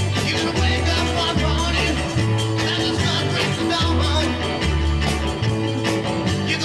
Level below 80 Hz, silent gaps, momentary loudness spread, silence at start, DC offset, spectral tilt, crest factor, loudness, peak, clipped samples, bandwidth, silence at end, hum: -28 dBFS; none; 3 LU; 0 s; under 0.1%; -5 dB/octave; 12 dB; -20 LUFS; -8 dBFS; under 0.1%; 13 kHz; 0 s; none